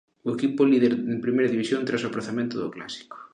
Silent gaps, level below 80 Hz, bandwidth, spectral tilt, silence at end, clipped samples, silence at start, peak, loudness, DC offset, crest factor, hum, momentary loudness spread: none; -70 dBFS; 10 kHz; -6 dB/octave; 0.1 s; under 0.1%; 0.25 s; -8 dBFS; -25 LUFS; under 0.1%; 16 dB; none; 13 LU